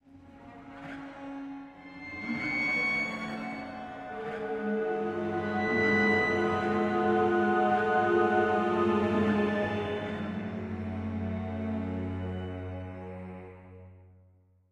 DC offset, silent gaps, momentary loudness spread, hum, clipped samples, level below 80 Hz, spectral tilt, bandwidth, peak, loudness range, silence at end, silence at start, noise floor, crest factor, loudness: under 0.1%; none; 17 LU; none; under 0.1%; -60 dBFS; -7 dB/octave; 9.4 kHz; -14 dBFS; 10 LU; 0.65 s; 0.1 s; -62 dBFS; 16 dB; -29 LUFS